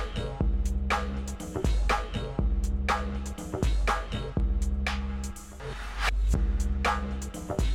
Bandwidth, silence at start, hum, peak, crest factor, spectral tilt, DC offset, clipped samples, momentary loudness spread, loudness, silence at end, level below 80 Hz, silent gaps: 13.5 kHz; 0 s; none; -14 dBFS; 14 dB; -5.5 dB/octave; under 0.1%; under 0.1%; 8 LU; -31 LUFS; 0 s; -30 dBFS; none